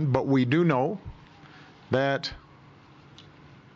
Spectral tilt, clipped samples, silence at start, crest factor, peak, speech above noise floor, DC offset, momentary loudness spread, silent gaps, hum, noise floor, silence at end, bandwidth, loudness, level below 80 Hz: -7.5 dB/octave; under 0.1%; 0 s; 20 dB; -8 dBFS; 28 dB; under 0.1%; 18 LU; none; none; -52 dBFS; 0.55 s; 7.6 kHz; -25 LUFS; -56 dBFS